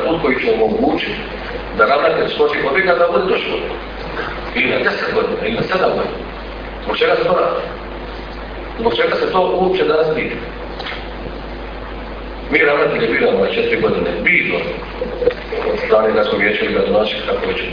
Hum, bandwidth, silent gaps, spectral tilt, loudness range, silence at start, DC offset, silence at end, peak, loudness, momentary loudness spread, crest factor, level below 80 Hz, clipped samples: none; 5.2 kHz; none; -7 dB/octave; 4 LU; 0 s; under 0.1%; 0 s; 0 dBFS; -16 LUFS; 15 LU; 16 dB; -34 dBFS; under 0.1%